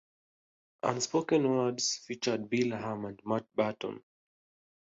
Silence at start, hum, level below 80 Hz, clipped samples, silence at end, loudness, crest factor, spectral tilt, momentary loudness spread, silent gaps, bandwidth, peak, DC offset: 0.85 s; none; -72 dBFS; under 0.1%; 0.85 s; -32 LUFS; 20 dB; -4 dB/octave; 11 LU; none; 8.2 kHz; -14 dBFS; under 0.1%